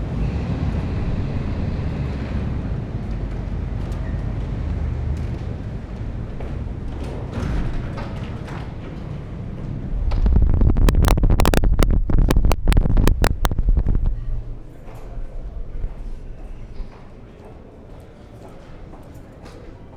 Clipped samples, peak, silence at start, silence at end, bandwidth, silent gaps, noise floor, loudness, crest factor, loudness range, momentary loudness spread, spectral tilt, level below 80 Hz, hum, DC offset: under 0.1%; -2 dBFS; 0 s; 0 s; over 20 kHz; none; -40 dBFS; -24 LUFS; 18 dB; 18 LU; 22 LU; -6.5 dB/octave; -22 dBFS; none; under 0.1%